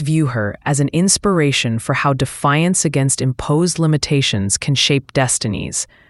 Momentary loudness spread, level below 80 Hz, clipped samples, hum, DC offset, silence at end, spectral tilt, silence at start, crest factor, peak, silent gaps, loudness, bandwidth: 5 LU; -42 dBFS; under 0.1%; none; under 0.1%; 0.25 s; -4 dB/octave; 0 s; 16 dB; 0 dBFS; none; -16 LUFS; 12 kHz